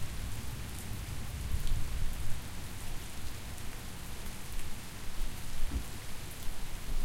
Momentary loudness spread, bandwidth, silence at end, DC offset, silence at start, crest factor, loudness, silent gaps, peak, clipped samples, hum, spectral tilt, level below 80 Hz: 6 LU; 16.5 kHz; 0 s; under 0.1%; 0 s; 14 dB; -42 LUFS; none; -18 dBFS; under 0.1%; none; -4 dB/octave; -38 dBFS